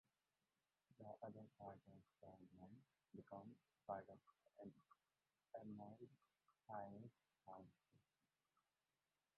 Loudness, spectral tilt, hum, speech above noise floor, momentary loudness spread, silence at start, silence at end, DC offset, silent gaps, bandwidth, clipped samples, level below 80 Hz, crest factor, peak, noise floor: -61 LUFS; -7.5 dB/octave; none; over 30 dB; 12 LU; 0.9 s; 1.35 s; under 0.1%; none; 4.2 kHz; under 0.1%; under -90 dBFS; 26 dB; -36 dBFS; under -90 dBFS